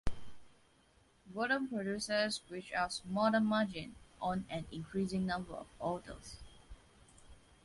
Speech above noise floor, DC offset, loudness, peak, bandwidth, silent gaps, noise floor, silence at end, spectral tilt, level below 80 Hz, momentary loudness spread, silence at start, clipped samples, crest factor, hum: 32 dB; under 0.1%; -37 LUFS; -20 dBFS; 11.5 kHz; none; -68 dBFS; 0.3 s; -5 dB/octave; -56 dBFS; 18 LU; 0.05 s; under 0.1%; 20 dB; none